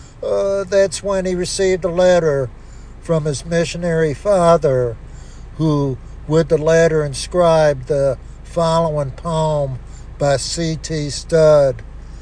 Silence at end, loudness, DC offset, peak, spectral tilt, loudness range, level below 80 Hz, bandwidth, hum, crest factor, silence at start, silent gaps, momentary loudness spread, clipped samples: 0 s; -17 LUFS; under 0.1%; -2 dBFS; -5.5 dB/octave; 2 LU; -34 dBFS; 10.5 kHz; none; 16 dB; 0 s; none; 12 LU; under 0.1%